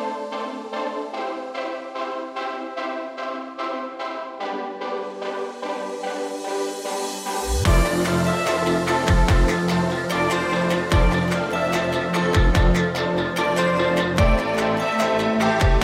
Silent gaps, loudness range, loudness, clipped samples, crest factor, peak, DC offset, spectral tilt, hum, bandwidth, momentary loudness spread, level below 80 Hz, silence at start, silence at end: none; 9 LU; -22 LUFS; under 0.1%; 16 dB; -6 dBFS; under 0.1%; -5.5 dB/octave; none; 15.5 kHz; 10 LU; -28 dBFS; 0 s; 0 s